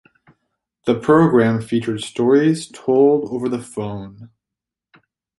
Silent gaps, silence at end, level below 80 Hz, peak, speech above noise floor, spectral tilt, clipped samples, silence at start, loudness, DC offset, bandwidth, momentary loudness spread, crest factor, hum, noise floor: none; 1.15 s; -56 dBFS; -2 dBFS; 69 dB; -7 dB/octave; under 0.1%; 0.85 s; -18 LUFS; under 0.1%; 11.5 kHz; 14 LU; 18 dB; none; -86 dBFS